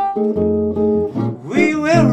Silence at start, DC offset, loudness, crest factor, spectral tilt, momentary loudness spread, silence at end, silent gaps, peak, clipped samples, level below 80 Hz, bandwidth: 0 s; under 0.1%; -17 LUFS; 14 dB; -7.5 dB/octave; 6 LU; 0 s; none; -2 dBFS; under 0.1%; -44 dBFS; 8.8 kHz